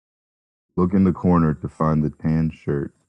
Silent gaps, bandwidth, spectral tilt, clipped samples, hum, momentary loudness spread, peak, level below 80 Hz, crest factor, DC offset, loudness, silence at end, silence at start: none; 5.8 kHz; -11 dB/octave; under 0.1%; none; 8 LU; -6 dBFS; -44 dBFS; 16 dB; under 0.1%; -21 LUFS; 0.2 s; 0.75 s